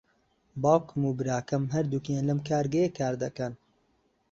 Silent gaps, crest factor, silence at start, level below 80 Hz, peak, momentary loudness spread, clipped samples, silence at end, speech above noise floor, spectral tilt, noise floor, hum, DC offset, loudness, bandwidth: none; 20 dB; 0.55 s; -62 dBFS; -8 dBFS; 8 LU; under 0.1%; 0.75 s; 43 dB; -7 dB/octave; -71 dBFS; none; under 0.1%; -29 LUFS; 7.6 kHz